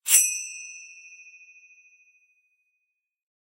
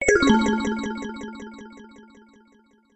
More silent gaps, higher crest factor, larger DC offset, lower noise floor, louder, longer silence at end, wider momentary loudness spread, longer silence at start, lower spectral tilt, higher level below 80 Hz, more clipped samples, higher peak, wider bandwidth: neither; first, 30 dB vs 22 dB; neither; first, -80 dBFS vs -58 dBFS; about the same, -22 LUFS vs -22 LUFS; first, 2.5 s vs 0.95 s; first, 29 LU vs 24 LU; about the same, 0.05 s vs 0 s; second, 7.5 dB/octave vs -4 dB/octave; second, -84 dBFS vs -46 dBFS; neither; first, 0 dBFS vs -4 dBFS; first, 16 kHz vs 9 kHz